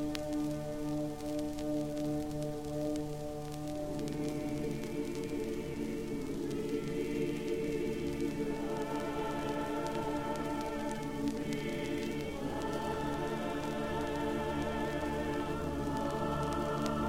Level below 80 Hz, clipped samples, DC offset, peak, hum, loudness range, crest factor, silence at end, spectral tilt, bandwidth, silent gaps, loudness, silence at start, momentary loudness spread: -50 dBFS; under 0.1%; 0.3%; -16 dBFS; none; 2 LU; 20 dB; 0 s; -6 dB/octave; 16 kHz; none; -37 LUFS; 0 s; 3 LU